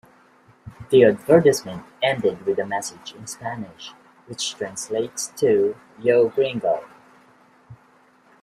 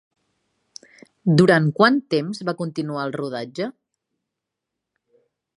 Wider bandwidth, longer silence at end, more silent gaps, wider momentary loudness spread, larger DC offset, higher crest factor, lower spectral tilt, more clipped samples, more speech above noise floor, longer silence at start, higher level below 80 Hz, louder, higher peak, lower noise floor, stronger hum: first, 13.5 kHz vs 11 kHz; second, 0.7 s vs 1.85 s; neither; first, 20 LU vs 14 LU; neither; about the same, 20 dB vs 22 dB; second, -4.5 dB/octave vs -7 dB/octave; neither; second, 35 dB vs 63 dB; second, 0.65 s vs 1.25 s; about the same, -62 dBFS vs -66 dBFS; about the same, -21 LUFS vs -21 LUFS; about the same, -2 dBFS vs 0 dBFS; second, -56 dBFS vs -83 dBFS; neither